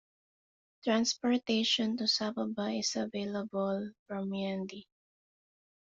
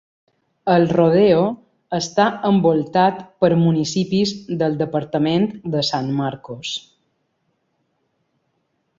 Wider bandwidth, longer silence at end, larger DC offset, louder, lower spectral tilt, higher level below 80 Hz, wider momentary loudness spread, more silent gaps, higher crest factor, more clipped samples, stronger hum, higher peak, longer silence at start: about the same, 7.8 kHz vs 7.8 kHz; second, 1.15 s vs 2.2 s; neither; second, -33 LUFS vs -19 LUFS; second, -3.5 dB/octave vs -6 dB/octave; second, -76 dBFS vs -58 dBFS; about the same, 10 LU vs 12 LU; first, 3.99-4.06 s vs none; about the same, 18 dB vs 18 dB; neither; neither; second, -16 dBFS vs -2 dBFS; first, 0.85 s vs 0.65 s